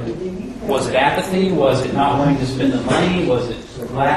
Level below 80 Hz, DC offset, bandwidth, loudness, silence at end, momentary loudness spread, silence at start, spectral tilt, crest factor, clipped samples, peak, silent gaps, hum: -40 dBFS; under 0.1%; 13 kHz; -18 LUFS; 0 s; 11 LU; 0 s; -6 dB/octave; 16 dB; under 0.1%; -2 dBFS; none; none